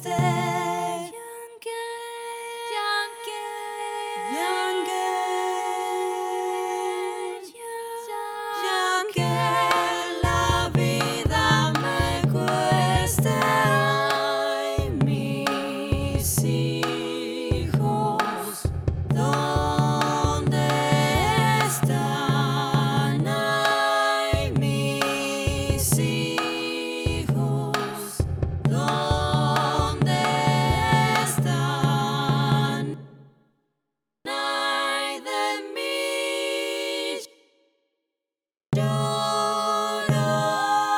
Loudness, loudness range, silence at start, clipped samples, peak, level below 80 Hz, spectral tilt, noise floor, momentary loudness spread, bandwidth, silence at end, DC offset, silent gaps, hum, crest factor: -24 LUFS; 6 LU; 0 s; under 0.1%; -4 dBFS; -40 dBFS; -5 dB/octave; -90 dBFS; 10 LU; 17.5 kHz; 0 s; under 0.1%; none; none; 20 dB